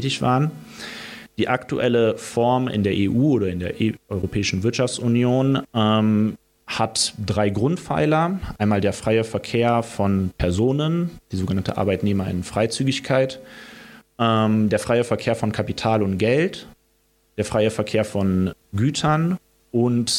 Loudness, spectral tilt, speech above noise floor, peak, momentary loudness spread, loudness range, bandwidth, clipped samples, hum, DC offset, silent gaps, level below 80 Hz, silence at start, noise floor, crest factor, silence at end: -21 LUFS; -5.5 dB/octave; 43 dB; -4 dBFS; 8 LU; 2 LU; 16 kHz; under 0.1%; none; under 0.1%; none; -48 dBFS; 0 s; -63 dBFS; 18 dB; 0 s